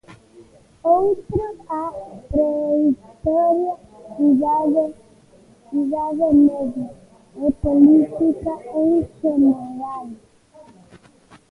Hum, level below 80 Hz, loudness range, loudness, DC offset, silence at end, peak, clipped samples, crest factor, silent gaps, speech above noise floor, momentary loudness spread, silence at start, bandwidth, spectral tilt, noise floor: none; -44 dBFS; 4 LU; -19 LUFS; under 0.1%; 0.9 s; -2 dBFS; under 0.1%; 18 dB; none; 32 dB; 15 LU; 0.1 s; 2.7 kHz; -10 dB/octave; -51 dBFS